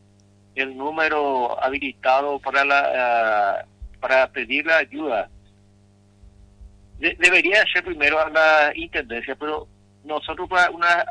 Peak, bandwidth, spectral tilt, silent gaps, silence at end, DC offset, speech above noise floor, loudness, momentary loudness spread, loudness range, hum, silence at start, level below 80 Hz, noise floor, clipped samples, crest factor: -4 dBFS; 10.5 kHz; -3 dB/octave; none; 0 s; under 0.1%; 34 dB; -20 LUFS; 13 LU; 5 LU; 50 Hz at -55 dBFS; 0.55 s; -50 dBFS; -54 dBFS; under 0.1%; 18 dB